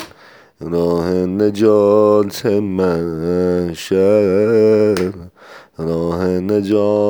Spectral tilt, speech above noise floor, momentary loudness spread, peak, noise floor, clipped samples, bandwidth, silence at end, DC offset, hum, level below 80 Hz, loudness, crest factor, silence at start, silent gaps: -7 dB/octave; 30 dB; 10 LU; -2 dBFS; -44 dBFS; under 0.1%; over 20 kHz; 0 s; under 0.1%; none; -48 dBFS; -15 LUFS; 14 dB; 0 s; none